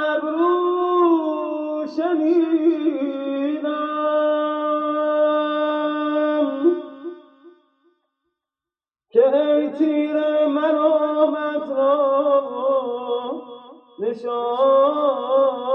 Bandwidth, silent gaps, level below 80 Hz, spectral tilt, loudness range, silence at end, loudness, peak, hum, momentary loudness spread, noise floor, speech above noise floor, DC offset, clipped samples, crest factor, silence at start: 5.8 kHz; none; -82 dBFS; -6.5 dB/octave; 5 LU; 0 s; -20 LUFS; -4 dBFS; none; 8 LU; under -90 dBFS; over 70 dB; under 0.1%; under 0.1%; 16 dB; 0 s